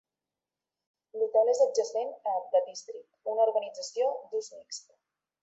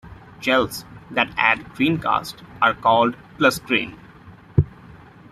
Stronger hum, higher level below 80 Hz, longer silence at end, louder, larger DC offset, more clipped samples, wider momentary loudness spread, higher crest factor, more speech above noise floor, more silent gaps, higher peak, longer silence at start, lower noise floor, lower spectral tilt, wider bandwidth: neither; second, -88 dBFS vs -46 dBFS; first, 0.65 s vs 0.35 s; second, -29 LUFS vs -20 LUFS; neither; neither; first, 17 LU vs 10 LU; about the same, 18 dB vs 20 dB; first, over 61 dB vs 24 dB; neither; second, -14 dBFS vs -2 dBFS; first, 1.15 s vs 0.05 s; first, under -90 dBFS vs -45 dBFS; second, -0.5 dB/octave vs -5.5 dB/octave; second, 8.2 kHz vs 15 kHz